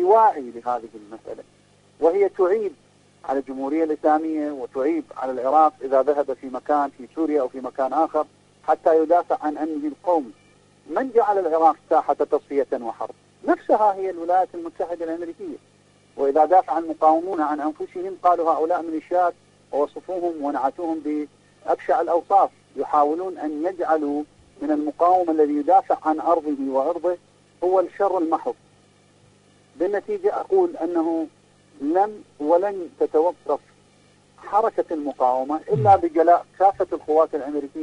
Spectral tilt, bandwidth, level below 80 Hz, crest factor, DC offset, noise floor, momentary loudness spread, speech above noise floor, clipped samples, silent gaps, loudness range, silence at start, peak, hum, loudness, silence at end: -7.5 dB/octave; 10.5 kHz; -64 dBFS; 18 dB; under 0.1%; -56 dBFS; 12 LU; 35 dB; under 0.1%; none; 4 LU; 0 s; -4 dBFS; 50 Hz at -60 dBFS; -22 LUFS; 0 s